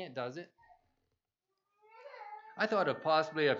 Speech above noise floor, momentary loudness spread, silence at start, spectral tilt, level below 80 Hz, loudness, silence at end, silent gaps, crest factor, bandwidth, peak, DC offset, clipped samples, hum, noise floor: 54 dB; 21 LU; 0 s; -5.5 dB/octave; -88 dBFS; -33 LUFS; 0 s; none; 20 dB; 7.6 kHz; -16 dBFS; under 0.1%; under 0.1%; none; -87 dBFS